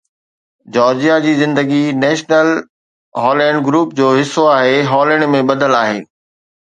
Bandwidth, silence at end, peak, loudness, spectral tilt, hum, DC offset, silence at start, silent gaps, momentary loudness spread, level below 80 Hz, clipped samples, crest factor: 9.4 kHz; 0.6 s; 0 dBFS; -13 LUFS; -5.5 dB/octave; none; under 0.1%; 0.7 s; 2.70-3.12 s; 6 LU; -62 dBFS; under 0.1%; 14 dB